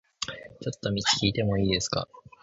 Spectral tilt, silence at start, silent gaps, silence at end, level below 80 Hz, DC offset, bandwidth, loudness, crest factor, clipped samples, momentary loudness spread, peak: -4 dB/octave; 0.2 s; none; 0.25 s; -48 dBFS; under 0.1%; 8 kHz; -27 LUFS; 20 dB; under 0.1%; 13 LU; -8 dBFS